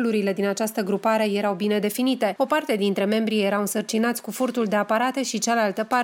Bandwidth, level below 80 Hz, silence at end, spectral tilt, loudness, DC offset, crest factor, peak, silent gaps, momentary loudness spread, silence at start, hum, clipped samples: 17 kHz; -74 dBFS; 0 s; -4.5 dB/octave; -23 LUFS; under 0.1%; 14 dB; -8 dBFS; none; 3 LU; 0 s; none; under 0.1%